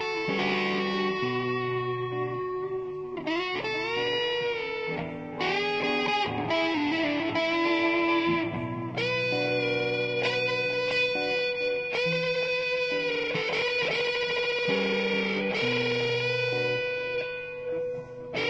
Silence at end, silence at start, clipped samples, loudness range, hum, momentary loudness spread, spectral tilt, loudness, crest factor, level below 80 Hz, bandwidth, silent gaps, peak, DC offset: 0 s; 0 s; under 0.1%; 3 LU; none; 7 LU; -5 dB/octave; -27 LUFS; 14 dB; -62 dBFS; 8 kHz; none; -14 dBFS; under 0.1%